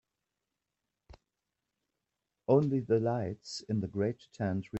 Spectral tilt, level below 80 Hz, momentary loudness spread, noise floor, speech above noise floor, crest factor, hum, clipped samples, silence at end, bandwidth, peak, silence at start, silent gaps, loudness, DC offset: -7.5 dB/octave; -68 dBFS; 11 LU; -88 dBFS; 56 dB; 20 dB; none; under 0.1%; 0 s; 8.4 kHz; -14 dBFS; 2.5 s; none; -32 LUFS; under 0.1%